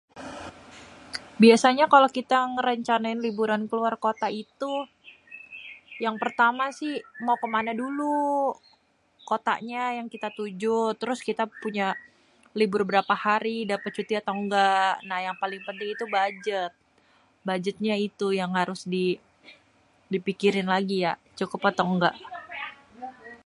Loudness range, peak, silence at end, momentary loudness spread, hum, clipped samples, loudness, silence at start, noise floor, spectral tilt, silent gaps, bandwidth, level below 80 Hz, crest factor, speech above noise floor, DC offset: 7 LU; -4 dBFS; 0.1 s; 17 LU; none; under 0.1%; -26 LUFS; 0.15 s; -64 dBFS; -5 dB/octave; none; 11.5 kHz; -70 dBFS; 22 dB; 39 dB; under 0.1%